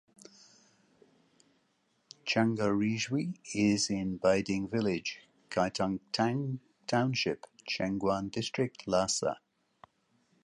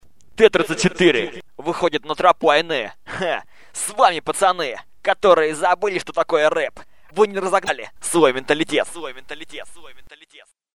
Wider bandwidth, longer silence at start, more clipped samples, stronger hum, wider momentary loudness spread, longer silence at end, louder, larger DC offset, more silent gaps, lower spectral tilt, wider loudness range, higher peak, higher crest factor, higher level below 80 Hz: second, 11.5 kHz vs 13.5 kHz; first, 2.25 s vs 0 s; neither; neither; second, 9 LU vs 15 LU; first, 1.05 s vs 0.05 s; second, -32 LUFS vs -19 LUFS; second, under 0.1% vs 0.8%; neither; about the same, -4.5 dB/octave vs -3.5 dB/octave; about the same, 4 LU vs 3 LU; second, -14 dBFS vs 0 dBFS; about the same, 18 dB vs 20 dB; second, -64 dBFS vs -54 dBFS